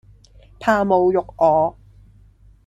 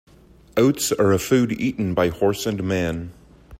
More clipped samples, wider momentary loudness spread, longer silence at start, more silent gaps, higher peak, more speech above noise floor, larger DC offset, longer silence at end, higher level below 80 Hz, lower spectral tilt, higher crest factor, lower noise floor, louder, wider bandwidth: neither; about the same, 7 LU vs 8 LU; about the same, 0.6 s vs 0.55 s; neither; first, -2 dBFS vs -6 dBFS; first, 33 dB vs 29 dB; neither; first, 0.95 s vs 0.05 s; about the same, -48 dBFS vs -48 dBFS; first, -7 dB/octave vs -5.5 dB/octave; about the same, 18 dB vs 16 dB; about the same, -50 dBFS vs -49 dBFS; first, -18 LUFS vs -21 LUFS; second, 13 kHz vs 16.5 kHz